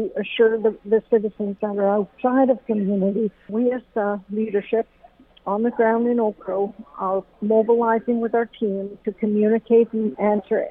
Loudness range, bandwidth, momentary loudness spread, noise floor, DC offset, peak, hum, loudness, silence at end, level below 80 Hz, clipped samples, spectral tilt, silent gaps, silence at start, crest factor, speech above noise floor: 3 LU; 3.8 kHz; 8 LU; -51 dBFS; under 0.1%; -6 dBFS; none; -21 LUFS; 0 s; -60 dBFS; under 0.1%; -10.5 dB/octave; none; 0 s; 14 dB; 31 dB